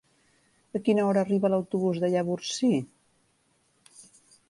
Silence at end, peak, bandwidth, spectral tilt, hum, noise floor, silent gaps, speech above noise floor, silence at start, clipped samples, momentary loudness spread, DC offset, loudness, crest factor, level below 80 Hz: 0.45 s; -12 dBFS; 11.5 kHz; -6 dB/octave; none; -69 dBFS; none; 44 dB; 0.75 s; under 0.1%; 6 LU; under 0.1%; -26 LUFS; 16 dB; -72 dBFS